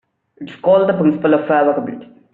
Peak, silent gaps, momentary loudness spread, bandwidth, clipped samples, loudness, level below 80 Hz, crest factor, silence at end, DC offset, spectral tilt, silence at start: -2 dBFS; none; 21 LU; 4.2 kHz; under 0.1%; -15 LUFS; -60 dBFS; 14 dB; 0.3 s; under 0.1%; -6 dB/octave; 0.4 s